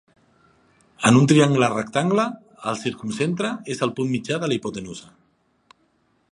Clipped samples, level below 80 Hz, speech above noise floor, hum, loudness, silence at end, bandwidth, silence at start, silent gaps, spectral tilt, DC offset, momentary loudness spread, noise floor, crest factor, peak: under 0.1%; -62 dBFS; 44 dB; none; -21 LUFS; 1.3 s; 11.5 kHz; 1 s; none; -5.5 dB/octave; under 0.1%; 15 LU; -65 dBFS; 22 dB; -2 dBFS